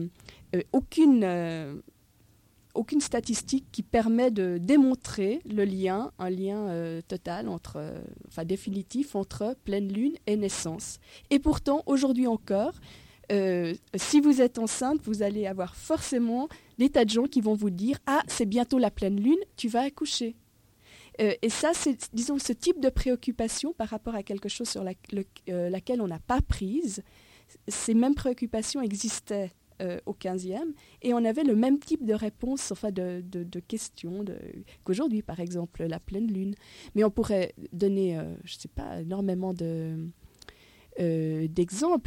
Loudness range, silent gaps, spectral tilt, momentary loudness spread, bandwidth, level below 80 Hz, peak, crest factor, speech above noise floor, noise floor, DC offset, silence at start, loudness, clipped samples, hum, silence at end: 7 LU; none; -5 dB/octave; 12 LU; 16.5 kHz; -48 dBFS; -12 dBFS; 18 dB; 34 dB; -62 dBFS; under 0.1%; 0 s; -29 LUFS; under 0.1%; none; 0.05 s